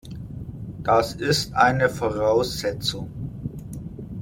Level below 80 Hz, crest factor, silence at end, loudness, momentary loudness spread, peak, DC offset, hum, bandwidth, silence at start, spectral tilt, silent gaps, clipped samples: -44 dBFS; 20 dB; 0 s; -22 LUFS; 17 LU; -4 dBFS; under 0.1%; none; 16.5 kHz; 0.05 s; -4.5 dB/octave; none; under 0.1%